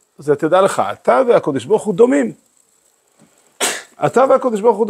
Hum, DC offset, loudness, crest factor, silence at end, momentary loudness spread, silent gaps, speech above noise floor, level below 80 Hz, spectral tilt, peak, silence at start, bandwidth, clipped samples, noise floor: none; under 0.1%; -15 LUFS; 16 dB; 0 s; 7 LU; none; 44 dB; -66 dBFS; -4.5 dB/octave; 0 dBFS; 0.2 s; 16 kHz; under 0.1%; -58 dBFS